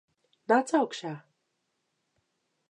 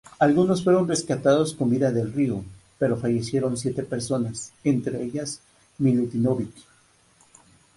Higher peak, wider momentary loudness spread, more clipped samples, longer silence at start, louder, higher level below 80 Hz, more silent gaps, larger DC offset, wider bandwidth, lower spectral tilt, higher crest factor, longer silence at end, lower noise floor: second, -10 dBFS vs -6 dBFS; first, 20 LU vs 10 LU; neither; first, 0.5 s vs 0.2 s; second, -27 LUFS vs -24 LUFS; second, -88 dBFS vs -56 dBFS; neither; neither; about the same, 11 kHz vs 11.5 kHz; second, -4.5 dB/octave vs -6 dB/octave; about the same, 22 dB vs 18 dB; first, 1.5 s vs 1.15 s; first, -79 dBFS vs -59 dBFS